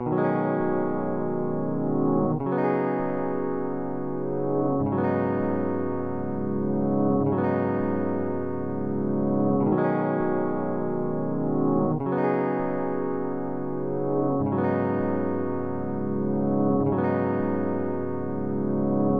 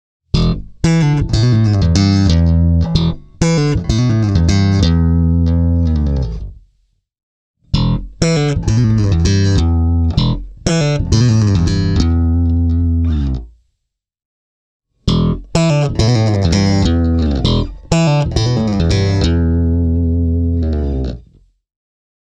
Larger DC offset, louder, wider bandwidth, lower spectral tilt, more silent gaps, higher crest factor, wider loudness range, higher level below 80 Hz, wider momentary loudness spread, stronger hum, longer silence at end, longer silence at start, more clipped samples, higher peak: first, 2% vs under 0.1%; second, -26 LUFS vs -14 LUFS; second, 4.6 kHz vs 9 kHz; first, -12 dB/octave vs -6.5 dB/octave; second, none vs 7.23-7.54 s, 14.25-14.80 s; about the same, 14 dB vs 14 dB; second, 2 LU vs 5 LU; second, -54 dBFS vs -22 dBFS; about the same, 6 LU vs 6 LU; neither; second, 0 s vs 1.1 s; second, 0 s vs 0.35 s; neither; second, -12 dBFS vs 0 dBFS